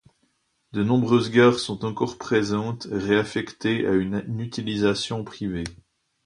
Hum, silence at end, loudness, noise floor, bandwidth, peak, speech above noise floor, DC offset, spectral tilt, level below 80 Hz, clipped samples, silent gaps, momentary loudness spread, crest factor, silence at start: none; 0.5 s; -24 LUFS; -69 dBFS; 11 kHz; -4 dBFS; 46 dB; under 0.1%; -6 dB/octave; -52 dBFS; under 0.1%; none; 11 LU; 20 dB; 0.75 s